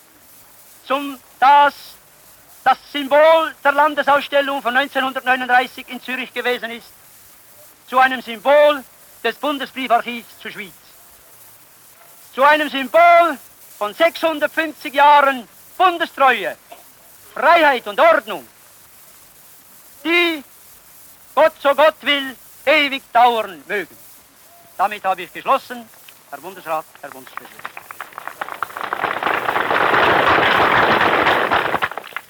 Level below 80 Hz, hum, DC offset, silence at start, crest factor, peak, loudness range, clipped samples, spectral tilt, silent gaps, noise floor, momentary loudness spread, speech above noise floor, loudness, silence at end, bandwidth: -58 dBFS; none; under 0.1%; 0.85 s; 14 dB; -4 dBFS; 9 LU; under 0.1%; -3.5 dB/octave; none; -47 dBFS; 19 LU; 30 dB; -16 LUFS; 0.1 s; over 20 kHz